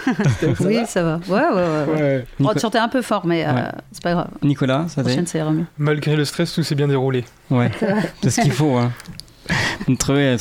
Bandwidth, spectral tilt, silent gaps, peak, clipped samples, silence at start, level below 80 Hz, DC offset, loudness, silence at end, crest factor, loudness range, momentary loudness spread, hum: 16 kHz; -6 dB/octave; none; -2 dBFS; under 0.1%; 0 s; -44 dBFS; under 0.1%; -19 LUFS; 0 s; 16 dB; 2 LU; 5 LU; none